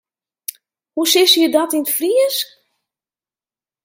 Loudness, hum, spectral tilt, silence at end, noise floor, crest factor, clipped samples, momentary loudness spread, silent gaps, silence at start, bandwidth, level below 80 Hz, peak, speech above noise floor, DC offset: -14 LUFS; none; 0 dB/octave; 1.4 s; under -90 dBFS; 18 dB; under 0.1%; 20 LU; none; 0.95 s; 17 kHz; -76 dBFS; 0 dBFS; over 75 dB; under 0.1%